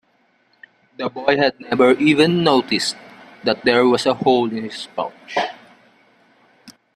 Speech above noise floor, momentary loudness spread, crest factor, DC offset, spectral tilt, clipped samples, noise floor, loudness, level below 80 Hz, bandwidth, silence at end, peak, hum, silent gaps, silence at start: 44 dB; 13 LU; 18 dB; under 0.1%; -5 dB/octave; under 0.1%; -61 dBFS; -18 LUFS; -60 dBFS; 13.5 kHz; 0.25 s; 0 dBFS; none; none; 1 s